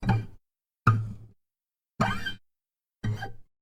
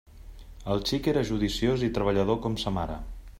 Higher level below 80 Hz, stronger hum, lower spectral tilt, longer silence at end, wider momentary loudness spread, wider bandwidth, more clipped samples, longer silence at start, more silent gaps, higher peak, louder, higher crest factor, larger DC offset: about the same, -46 dBFS vs -42 dBFS; neither; about the same, -6.5 dB/octave vs -6 dB/octave; first, 0.2 s vs 0 s; first, 19 LU vs 8 LU; second, 12.5 kHz vs 16 kHz; neither; about the same, 0 s vs 0.1 s; neither; first, -6 dBFS vs -10 dBFS; about the same, -30 LUFS vs -28 LUFS; first, 26 dB vs 18 dB; neither